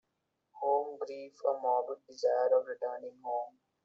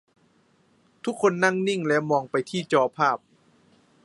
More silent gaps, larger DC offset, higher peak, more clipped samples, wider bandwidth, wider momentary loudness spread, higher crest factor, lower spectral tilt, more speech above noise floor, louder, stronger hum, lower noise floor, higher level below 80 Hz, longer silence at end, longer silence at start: neither; neither; second, -18 dBFS vs -4 dBFS; neither; second, 7.2 kHz vs 11.5 kHz; first, 13 LU vs 10 LU; about the same, 18 dB vs 22 dB; second, -1 dB/octave vs -5 dB/octave; first, 49 dB vs 40 dB; second, -34 LUFS vs -24 LUFS; neither; first, -83 dBFS vs -63 dBFS; second, -90 dBFS vs -74 dBFS; second, 0.35 s vs 0.9 s; second, 0.55 s vs 1.05 s